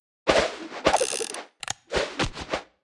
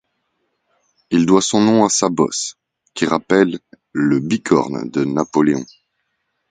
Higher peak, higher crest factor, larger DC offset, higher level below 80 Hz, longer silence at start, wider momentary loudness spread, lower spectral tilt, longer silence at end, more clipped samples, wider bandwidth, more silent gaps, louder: second, -4 dBFS vs 0 dBFS; first, 24 dB vs 18 dB; neither; first, -46 dBFS vs -56 dBFS; second, 0.25 s vs 1.1 s; about the same, 11 LU vs 11 LU; second, -2.5 dB/octave vs -4.5 dB/octave; second, 0.2 s vs 0.85 s; neither; first, 12 kHz vs 9.6 kHz; neither; second, -26 LUFS vs -17 LUFS